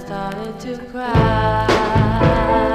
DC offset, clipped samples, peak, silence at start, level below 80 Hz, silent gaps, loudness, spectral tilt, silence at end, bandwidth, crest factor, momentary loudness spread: 0.2%; under 0.1%; -2 dBFS; 0 s; -28 dBFS; none; -17 LUFS; -7 dB/octave; 0 s; 13 kHz; 16 dB; 13 LU